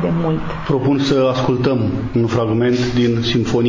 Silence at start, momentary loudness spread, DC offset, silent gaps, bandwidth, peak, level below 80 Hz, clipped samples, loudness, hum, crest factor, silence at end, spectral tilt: 0 s; 4 LU; under 0.1%; none; 7.6 kHz; -4 dBFS; -38 dBFS; under 0.1%; -17 LUFS; none; 12 dB; 0 s; -7 dB/octave